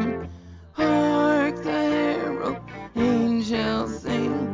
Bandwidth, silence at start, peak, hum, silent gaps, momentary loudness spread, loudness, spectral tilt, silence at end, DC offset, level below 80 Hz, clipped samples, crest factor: 7.6 kHz; 0 s; -10 dBFS; none; none; 13 LU; -24 LUFS; -6.5 dB/octave; 0 s; under 0.1%; -48 dBFS; under 0.1%; 14 dB